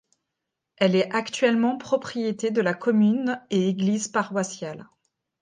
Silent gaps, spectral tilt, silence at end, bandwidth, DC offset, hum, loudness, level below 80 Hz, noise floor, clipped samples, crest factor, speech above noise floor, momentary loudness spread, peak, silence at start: none; -5.5 dB/octave; 0.6 s; 9.8 kHz; under 0.1%; none; -24 LUFS; -72 dBFS; -83 dBFS; under 0.1%; 18 dB; 60 dB; 8 LU; -8 dBFS; 0.8 s